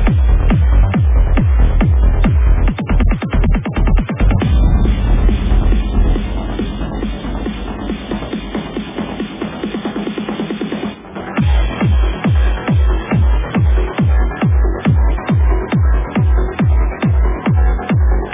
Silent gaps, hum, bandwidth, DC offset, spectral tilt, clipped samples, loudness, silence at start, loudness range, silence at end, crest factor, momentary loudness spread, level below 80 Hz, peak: none; none; 3.8 kHz; under 0.1%; -11.5 dB/octave; under 0.1%; -16 LUFS; 0 s; 8 LU; 0 s; 12 dB; 9 LU; -14 dBFS; -2 dBFS